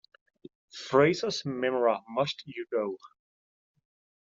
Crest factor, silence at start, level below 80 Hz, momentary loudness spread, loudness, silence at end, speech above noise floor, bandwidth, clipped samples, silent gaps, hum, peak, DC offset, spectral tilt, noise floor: 22 dB; 0.75 s; -74 dBFS; 17 LU; -29 LUFS; 1.2 s; over 62 dB; 7.8 kHz; under 0.1%; none; none; -8 dBFS; under 0.1%; -5 dB/octave; under -90 dBFS